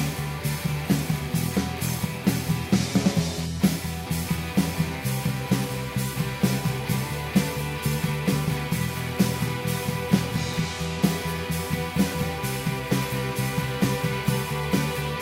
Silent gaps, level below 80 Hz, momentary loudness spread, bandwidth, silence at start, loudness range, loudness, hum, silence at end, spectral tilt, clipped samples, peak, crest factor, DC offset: none; -42 dBFS; 4 LU; 16.5 kHz; 0 s; 1 LU; -26 LUFS; none; 0 s; -5.5 dB/octave; under 0.1%; -6 dBFS; 20 dB; under 0.1%